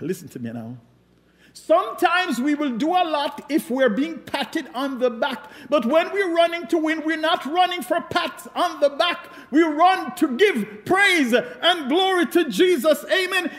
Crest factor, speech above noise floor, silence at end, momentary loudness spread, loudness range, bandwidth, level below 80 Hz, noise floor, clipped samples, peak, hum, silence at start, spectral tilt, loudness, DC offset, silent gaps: 16 dB; 36 dB; 0 s; 10 LU; 4 LU; 16 kHz; -66 dBFS; -57 dBFS; under 0.1%; -6 dBFS; none; 0 s; -4 dB/octave; -21 LUFS; under 0.1%; none